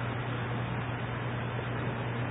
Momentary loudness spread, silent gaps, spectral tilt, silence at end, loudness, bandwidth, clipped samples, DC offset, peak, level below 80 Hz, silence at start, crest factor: 1 LU; none; -4.5 dB/octave; 0 s; -34 LUFS; 3.9 kHz; under 0.1%; under 0.1%; -22 dBFS; -50 dBFS; 0 s; 12 dB